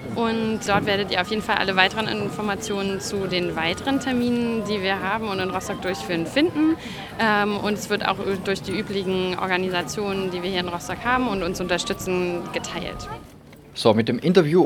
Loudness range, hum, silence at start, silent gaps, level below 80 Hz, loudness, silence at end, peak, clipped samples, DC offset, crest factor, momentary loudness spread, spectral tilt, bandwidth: 2 LU; none; 0 s; none; -48 dBFS; -23 LUFS; 0 s; 0 dBFS; under 0.1%; under 0.1%; 24 dB; 8 LU; -4.5 dB/octave; 19 kHz